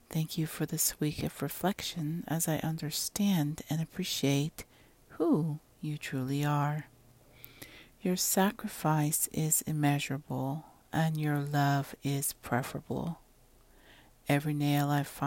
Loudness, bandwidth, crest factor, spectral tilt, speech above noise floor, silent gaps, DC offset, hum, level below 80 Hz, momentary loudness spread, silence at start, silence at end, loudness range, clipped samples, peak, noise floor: -32 LUFS; 16.5 kHz; 20 dB; -4.5 dB/octave; 30 dB; none; under 0.1%; none; -62 dBFS; 10 LU; 0.1 s; 0 s; 4 LU; under 0.1%; -14 dBFS; -61 dBFS